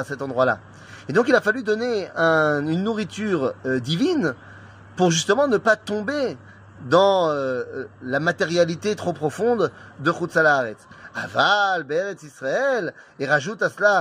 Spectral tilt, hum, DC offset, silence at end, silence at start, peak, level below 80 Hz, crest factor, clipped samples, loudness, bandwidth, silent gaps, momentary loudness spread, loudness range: -4.5 dB/octave; none; under 0.1%; 0 s; 0 s; -4 dBFS; -64 dBFS; 18 dB; under 0.1%; -22 LUFS; 15.5 kHz; none; 13 LU; 1 LU